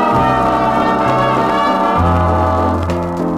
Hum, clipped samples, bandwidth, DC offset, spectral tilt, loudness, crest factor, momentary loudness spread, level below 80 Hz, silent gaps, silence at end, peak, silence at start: none; under 0.1%; 13.5 kHz; 0.2%; -7 dB/octave; -14 LUFS; 12 dB; 3 LU; -30 dBFS; none; 0 s; -2 dBFS; 0 s